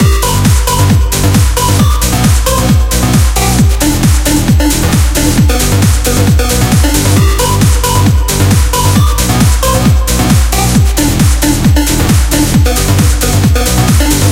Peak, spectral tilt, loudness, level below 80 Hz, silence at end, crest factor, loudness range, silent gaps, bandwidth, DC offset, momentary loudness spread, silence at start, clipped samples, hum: 0 dBFS; -4.5 dB/octave; -9 LUFS; -12 dBFS; 0 s; 8 dB; 0 LU; none; 17 kHz; under 0.1%; 1 LU; 0 s; 0.2%; none